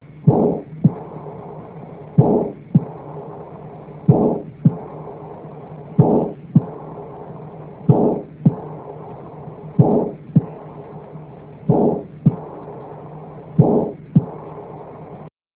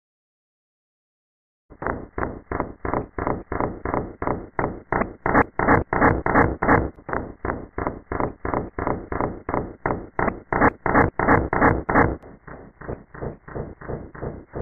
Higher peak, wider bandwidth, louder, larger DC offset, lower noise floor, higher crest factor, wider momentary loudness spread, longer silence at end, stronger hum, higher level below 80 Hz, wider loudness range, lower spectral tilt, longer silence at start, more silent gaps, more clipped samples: first, 0 dBFS vs -4 dBFS; second, 3.5 kHz vs 4.4 kHz; first, -19 LUFS vs -23 LUFS; second, under 0.1% vs 0.2%; about the same, -39 dBFS vs -42 dBFS; about the same, 20 dB vs 20 dB; first, 20 LU vs 16 LU; first, 0.25 s vs 0 s; neither; second, -48 dBFS vs -36 dBFS; second, 3 LU vs 8 LU; first, -14.5 dB/octave vs -11 dB/octave; second, 0.15 s vs 1.7 s; neither; neither